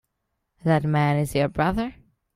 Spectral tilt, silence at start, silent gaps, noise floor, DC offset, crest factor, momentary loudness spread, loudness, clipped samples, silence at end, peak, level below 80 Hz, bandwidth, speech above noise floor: -7 dB/octave; 0.65 s; none; -78 dBFS; under 0.1%; 18 dB; 8 LU; -23 LUFS; under 0.1%; 0.45 s; -6 dBFS; -46 dBFS; 15 kHz; 56 dB